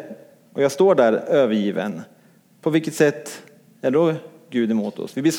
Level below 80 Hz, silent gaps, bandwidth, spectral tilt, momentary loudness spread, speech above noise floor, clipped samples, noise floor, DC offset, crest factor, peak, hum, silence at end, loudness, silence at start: -74 dBFS; none; 17 kHz; -5.5 dB/octave; 17 LU; 35 dB; under 0.1%; -54 dBFS; under 0.1%; 18 dB; -4 dBFS; none; 0 s; -20 LUFS; 0 s